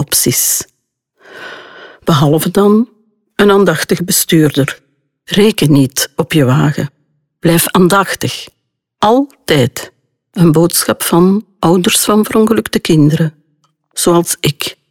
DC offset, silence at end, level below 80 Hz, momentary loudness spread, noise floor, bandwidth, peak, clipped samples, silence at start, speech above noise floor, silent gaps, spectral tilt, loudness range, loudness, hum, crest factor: under 0.1%; 0.2 s; -44 dBFS; 15 LU; -63 dBFS; 18.5 kHz; 0 dBFS; under 0.1%; 0 s; 53 dB; none; -4.5 dB/octave; 2 LU; -11 LUFS; none; 12 dB